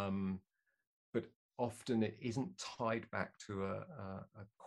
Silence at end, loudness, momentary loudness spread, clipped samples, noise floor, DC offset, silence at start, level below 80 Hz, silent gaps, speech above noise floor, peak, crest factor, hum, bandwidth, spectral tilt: 0 s; -42 LUFS; 11 LU; under 0.1%; -72 dBFS; under 0.1%; 0 s; -76 dBFS; 0.87-1.13 s, 1.36-1.49 s; 31 dB; -22 dBFS; 22 dB; none; 12 kHz; -6 dB/octave